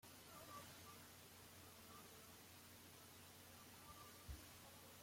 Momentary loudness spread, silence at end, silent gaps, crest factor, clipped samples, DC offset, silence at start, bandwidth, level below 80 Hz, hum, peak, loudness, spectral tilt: 4 LU; 0 s; none; 18 dB; under 0.1%; under 0.1%; 0 s; 16.5 kHz; -72 dBFS; none; -42 dBFS; -60 LUFS; -3 dB/octave